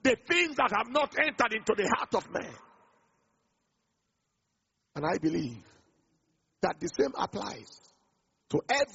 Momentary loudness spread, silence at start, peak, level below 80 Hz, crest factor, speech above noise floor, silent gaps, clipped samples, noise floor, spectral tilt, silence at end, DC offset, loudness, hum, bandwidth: 14 LU; 0.05 s; -8 dBFS; -66 dBFS; 24 dB; 50 dB; none; under 0.1%; -80 dBFS; -2.5 dB/octave; 0.05 s; under 0.1%; -30 LUFS; none; 8 kHz